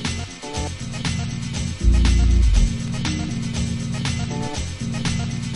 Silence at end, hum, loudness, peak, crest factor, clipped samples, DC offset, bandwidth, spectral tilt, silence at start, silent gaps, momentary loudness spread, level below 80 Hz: 0 s; none; -23 LUFS; -4 dBFS; 16 dB; under 0.1%; under 0.1%; 11.5 kHz; -5 dB/octave; 0 s; none; 10 LU; -22 dBFS